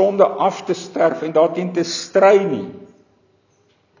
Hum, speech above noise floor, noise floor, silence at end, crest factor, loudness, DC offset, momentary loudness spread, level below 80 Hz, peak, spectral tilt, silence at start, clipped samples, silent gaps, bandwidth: none; 43 dB; -60 dBFS; 1.15 s; 18 dB; -17 LUFS; under 0.1%; 12 LU; -68 dBFS; 0 dBFS; -5 dB/octave; 0 s; under 0.1%; none; 7.4 kHz